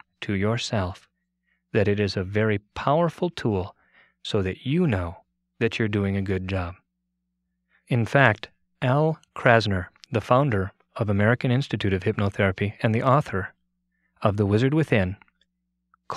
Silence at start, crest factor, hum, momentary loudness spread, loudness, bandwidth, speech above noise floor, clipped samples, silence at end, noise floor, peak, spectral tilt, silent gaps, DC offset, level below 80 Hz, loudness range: 0.2 s; 24 dB; none; 10 LU; -24 LUFS; 11 kHz; 55 dB; under 0.1%; 0 s; -78 dBFS; 0 dBFS; -7 dB/octave; none; under 0.1%; -54 dBFS; 4 LU